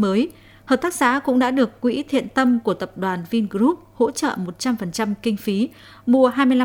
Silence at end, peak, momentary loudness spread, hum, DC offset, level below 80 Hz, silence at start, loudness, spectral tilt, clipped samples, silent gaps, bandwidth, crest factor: 0 s; -4 dBFS; 8 LU; none; under 0.1%; -56 dBFS; 0 s; -21 LUFS; -5 dB/octave; under 0.1%; none; 17.5 kHz; 16 dB